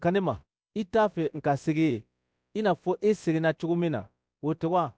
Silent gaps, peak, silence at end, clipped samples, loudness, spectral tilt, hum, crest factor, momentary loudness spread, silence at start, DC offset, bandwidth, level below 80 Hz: none; -14 dBFS; 0.05 s; under 0.1%; -28 LUFS; -7.5 dB/octave; none; 14 dB; 10 LU; 0 s; under 0.1%; 8 kHz; -62 dBFS